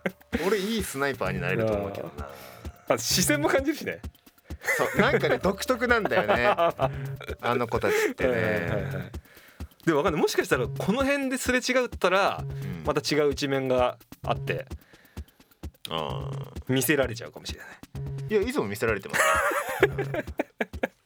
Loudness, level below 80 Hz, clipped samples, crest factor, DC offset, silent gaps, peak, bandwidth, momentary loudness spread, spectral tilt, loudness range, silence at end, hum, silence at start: -26 LUFS; -48 dBFS; under 0.1%; 24 dB; under 0.1%; none; -4 dBFS; over 20 kHz; 18 LU; -4.5 dB/octave; 5 LU; 0.15 s; none; 0.05 s